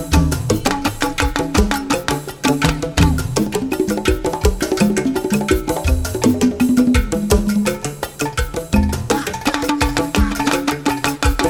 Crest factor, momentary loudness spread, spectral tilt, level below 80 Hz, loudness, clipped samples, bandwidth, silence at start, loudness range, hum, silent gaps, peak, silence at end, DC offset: 16 dB; 4 LU; -5 dB/octave; -24 dBFS; -18 LUFS; under 0.1%; 18.5 kHz; 0 s; 2 LU; none; none; 0 dBFS; 0 s; under 0.1%